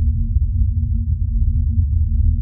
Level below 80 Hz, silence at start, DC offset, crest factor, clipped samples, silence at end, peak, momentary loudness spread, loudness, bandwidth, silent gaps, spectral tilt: -18 dBFS; 0 s; under 0.1%; 12 dB; under 0.1%; 0 s; -6 dBFS; 2 LU; -20 LUFS; 0.3 kHz; none; -28.5 dB/octave